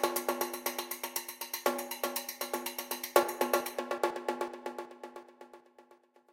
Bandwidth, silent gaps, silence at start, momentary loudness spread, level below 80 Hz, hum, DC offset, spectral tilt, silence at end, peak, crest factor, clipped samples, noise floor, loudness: 17 kHz; none; 0 s; 18 LU; -82 dBFS; none; under 0.1%; -1 dB/octave; 0.4 s; -6 dBFS; 28 dB; under 0.1%; -63 dBFS; -34 LUFS